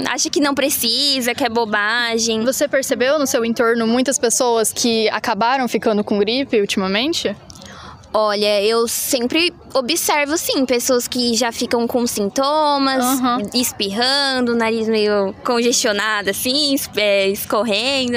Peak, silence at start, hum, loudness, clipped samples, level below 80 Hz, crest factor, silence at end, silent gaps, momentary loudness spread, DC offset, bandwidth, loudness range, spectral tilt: -4 dBFS; 0 s; none; -17 LUFS; under 0.1%; -54 dBFS; 14 dB; 0 s; none; 4 LU; under 0.1%; 16.5 kHz; 2 LU; -2.5 dB/octave